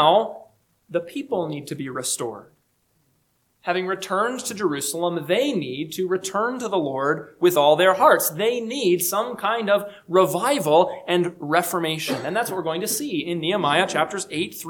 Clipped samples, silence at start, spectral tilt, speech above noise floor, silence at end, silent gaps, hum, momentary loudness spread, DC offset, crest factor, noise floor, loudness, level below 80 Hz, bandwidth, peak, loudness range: under 0.1%; 0 s; -3.5 dB/octave; 45 dB; 0 s; none; none; 10 LU; under 0.1%; 20 dB; -67 dBFS; -22 LUFS; -70 dBFS; 19 kHz; -2 dBFS; 8 LU